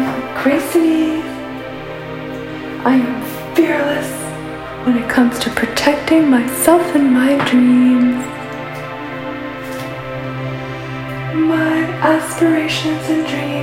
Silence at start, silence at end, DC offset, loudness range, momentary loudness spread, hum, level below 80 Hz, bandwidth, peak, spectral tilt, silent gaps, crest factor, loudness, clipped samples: 0 s; 0 s; under 0.1%; 8 LU; 14 LU; none; -46 dBFS; 16.5 kHz; 0 dBFS; -5 dB/octave; none; 16 dB; -16 LUFS; under 0.1%